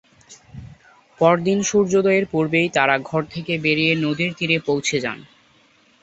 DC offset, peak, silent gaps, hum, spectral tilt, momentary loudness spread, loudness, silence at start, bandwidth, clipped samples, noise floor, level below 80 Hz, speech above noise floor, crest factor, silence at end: under 0.1%; -2 dBFS; none; none; -4.5 dB/octave; 8 LU; -19 LUFS; 0.3 s; 8.2 kHz; under 0.1%; -56 dBFS; -56 dBFS; 37 dB; 20 dB; 0.75 s